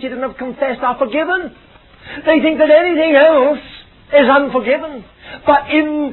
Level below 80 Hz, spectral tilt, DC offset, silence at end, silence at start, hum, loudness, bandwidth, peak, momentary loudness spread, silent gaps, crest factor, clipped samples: -48 dBFS; -8.5 dB/octave; under 0.1%; 0 s; 0 s; none; -14 LUFS; 4.2 kHz; 0 dBFS; 13 LU; none; 14 dB; under 0.1%